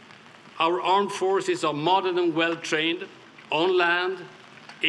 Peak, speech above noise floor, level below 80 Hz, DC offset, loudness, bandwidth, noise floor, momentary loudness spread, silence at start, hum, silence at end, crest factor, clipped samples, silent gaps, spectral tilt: -6 dBFS; 25 dB; -82 dBFS; under 0.1%; -24 LUFS; 11.5 kHz; -49 dBFS; 10 LU; 0.1 s; none; 0 s; 18 dB; under 0.1%; none; -4 dB/octave